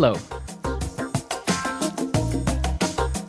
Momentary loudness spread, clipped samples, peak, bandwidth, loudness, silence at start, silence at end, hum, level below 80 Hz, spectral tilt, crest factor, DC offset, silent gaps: 7 LU; under 0.1%; -6 dBFS; 11 kHz; -26 LUFS; 0 s; 0 s; none; -32 dBFS; -5 dB/octave; 18 dB; under 0.1%; none